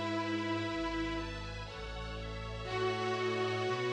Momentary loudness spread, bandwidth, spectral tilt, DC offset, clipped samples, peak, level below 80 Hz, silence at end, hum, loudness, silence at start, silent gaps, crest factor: 9 LU; 10 kHz; -5.5 dB/octave; under 0.1%; under 0.1%; -24 dBFS; -48 dBFS; 0 s; none; -37 LUFS; 0 s; none; 12 dB